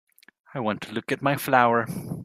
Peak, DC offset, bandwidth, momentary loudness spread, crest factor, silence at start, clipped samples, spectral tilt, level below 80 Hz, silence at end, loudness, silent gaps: -2 dBFS; under 0.1%; 15.5 kHz; 12 LU; 22 dB; 0.55 s; under 0.1%; -5.5 dB/octave; -64 dBFS; 0 s; -24 LUFS; none